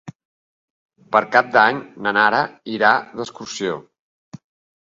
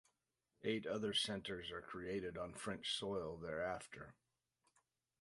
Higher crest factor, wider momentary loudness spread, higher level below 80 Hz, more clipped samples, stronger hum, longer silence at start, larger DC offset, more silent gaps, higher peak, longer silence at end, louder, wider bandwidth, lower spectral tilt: about the same, 20 dB vs 20 dB; first, 14 LU vs 10 LU; about the same, -66 dBFS vs -70 dBFS; neither; neither; second, 0.05 s vs 0.6 s; neither; first, 0.15-0.89 s, 3.99-4.32 s vs none; first, 0 dBFS vs -26 dBFS; second, 0.5 s vs 1.1 s; first, -18 LUFS vs -44 LUFS; second, 8 kHz vs 11.5 kHz; about the same, -4 dB/octave vs -4 dB/octave